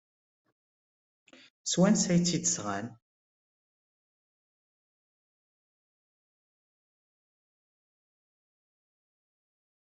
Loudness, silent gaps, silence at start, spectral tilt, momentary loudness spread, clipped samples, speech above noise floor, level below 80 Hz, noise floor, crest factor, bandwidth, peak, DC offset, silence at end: -28 LUFS; none; 1.65 s; -4.5 dB/octave; 14 LU; under 0.1%; over 63 dB; -70 dBFS; under -90 dBFS; 24 dB; 8.2 kHz; -12 dBFS; under 0.1%; 6.85 s